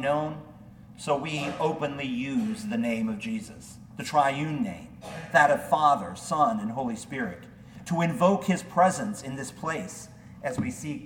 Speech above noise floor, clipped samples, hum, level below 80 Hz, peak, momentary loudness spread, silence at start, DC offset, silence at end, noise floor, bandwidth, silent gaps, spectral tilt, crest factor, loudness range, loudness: 21 dB; under 0.1%; none; -60 dBFS; -6 dBFS; 18 LU; 0 s; under 0.1%; 0 s; -48 dBFS; 18 kHz; none; -5.5 dB/octave; 22 dB; 5 LU; -27 LUFS